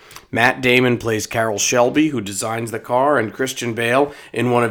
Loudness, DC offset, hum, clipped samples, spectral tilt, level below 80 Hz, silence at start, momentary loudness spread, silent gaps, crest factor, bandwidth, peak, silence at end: -18 LUFS; under 0.1%; none; under 0.1%; -4 dB/octave; -54 dBFS; 0.1 s; 8 LU; none; 18 dB; over 20 kHz; 0 dBFS; 0 s